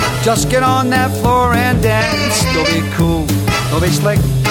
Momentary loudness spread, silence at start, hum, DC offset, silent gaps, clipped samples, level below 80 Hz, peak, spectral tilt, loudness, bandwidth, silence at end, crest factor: 3 LU; 0 s; none; under 0.1%; none; under 0.1%; -28 dBFS; -2 dBFS; -5 dB/octave; -13 LUFS; 18 kHz; 0 s; 12 dB